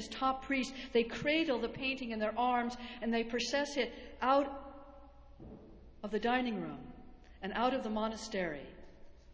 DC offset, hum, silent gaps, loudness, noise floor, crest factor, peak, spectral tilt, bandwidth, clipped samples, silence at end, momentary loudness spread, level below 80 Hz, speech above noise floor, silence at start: under 0.1%; none; none; -35 LUFS; -55 dBFS; 18 dB; -18 dBFS; -4 dB/octave; 8 kHz; under 0.1%; 0 s; 18 LU; -58 dBFS; 20 dB; 0 s